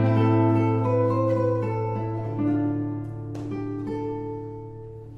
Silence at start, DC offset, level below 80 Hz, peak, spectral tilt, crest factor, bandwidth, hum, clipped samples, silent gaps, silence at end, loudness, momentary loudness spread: 0 s; under 0.1%; -52 dBFS; -10 dBFS; -10 dB/octave; 16 dB; 5.6 kHz; none; under 0.1%; none; 0 s; -25 LUFS; 14 LU